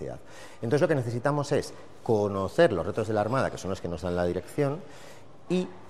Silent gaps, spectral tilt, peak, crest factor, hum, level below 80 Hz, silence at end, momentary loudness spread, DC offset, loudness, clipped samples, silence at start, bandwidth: none; -6.5 dB/octave; -10 dBFS; 18 dB; none; -58 dBFS; 0 s; 16 LU; 0.5%; -28 LUFS; under 0.1%; 0 s; 14 kHz